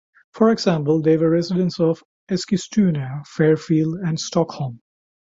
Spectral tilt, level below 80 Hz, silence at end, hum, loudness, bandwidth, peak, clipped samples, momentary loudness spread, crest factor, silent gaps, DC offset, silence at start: -6.5 dB/octave; -60 dBFS; 0.65 s; none; -20 LUFS; 7.8 kHz; -4 dBFS; under 0.1%; 10 LU; 16 dB; 2.05-2.27 s; under 0.1%; 0.35 s